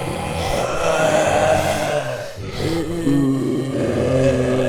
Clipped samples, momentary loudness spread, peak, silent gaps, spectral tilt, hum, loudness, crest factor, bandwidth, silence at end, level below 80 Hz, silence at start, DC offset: under 0.1%; 8 LU; -4 dBFS; none; -5.5 dB/octave; none; -19 LUFS; 14 dB; 19 kHz; 0 s; -38 dBFS; 0 s; under 0.1%